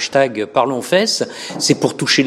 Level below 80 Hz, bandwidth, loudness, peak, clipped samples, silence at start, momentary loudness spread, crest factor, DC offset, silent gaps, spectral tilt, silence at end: -64 dBFS; 15 kHz; -16 LUFS; 0 dBFS; under 0.1%; 0 s; 5 LU; 16 dB; under 0.1%; none; -3.5 dB/octave; 0 s